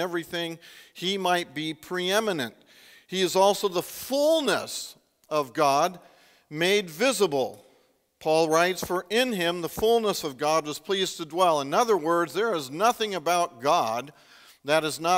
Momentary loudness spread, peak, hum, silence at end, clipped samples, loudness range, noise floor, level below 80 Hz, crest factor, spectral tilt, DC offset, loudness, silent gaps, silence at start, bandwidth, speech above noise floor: 11 LU; -6 dBFS; none; 0 s; under 0.1%; 2 LU; -65 dBFS; -64 dBFS; 20 dB; -3.5 dB/octave; under 0.1%; -25 LUFS; none; 0 s; 16 kHz; 39 dB